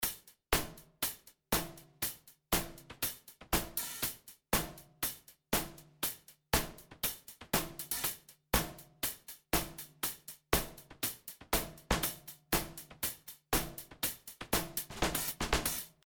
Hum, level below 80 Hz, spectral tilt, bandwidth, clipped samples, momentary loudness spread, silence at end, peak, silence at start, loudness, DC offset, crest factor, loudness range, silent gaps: none; -48 dBFS; -2.5 dB/octave; over 20 kHz; under 0.1%; 13 LU; 0.2 s; -12 dBFS; 0 s; -36 LUFS; under 0.1%; 26 dB; 1 LU; none